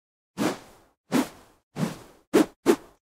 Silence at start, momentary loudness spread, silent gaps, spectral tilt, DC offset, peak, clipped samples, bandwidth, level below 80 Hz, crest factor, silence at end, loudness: 0.35 s; 18 LU; 0.97-1.04 s, 1.63-1.71 s, 2.27-2.32 s, 2.56-2.63 s; -5 dB/octave; under 0.1%; -6 dBFS; under 0.1%; 16 kHz; -64 dBFS; 22 dB; 0.35 s; -27 LUFS